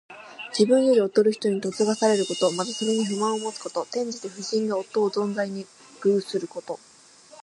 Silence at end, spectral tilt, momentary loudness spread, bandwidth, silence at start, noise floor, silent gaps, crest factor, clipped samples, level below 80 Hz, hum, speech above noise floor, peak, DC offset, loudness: 0.65 s; -4.5 dB/octave; 15 LU; 11.5 kHz; 0.1 s; -51 dBFS; none; 18 dB; under 0.1%; -76 dBFS; none; 27 dB; -6 dBFS; under 0.1%; -24 LUFS